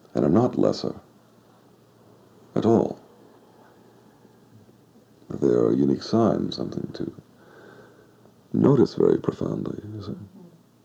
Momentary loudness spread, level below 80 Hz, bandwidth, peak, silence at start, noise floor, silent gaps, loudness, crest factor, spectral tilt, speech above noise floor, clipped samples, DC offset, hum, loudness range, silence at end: 16 LU; -58 dBFS; 8.2 kHz; -6 dBFS; 0.15 s; -55 dBFS; none; -23 LUFS; 20 dB; -8 dB/octave; 33 dB; under 0.1%; under 0.1%; none; 4 LU; 0.4 s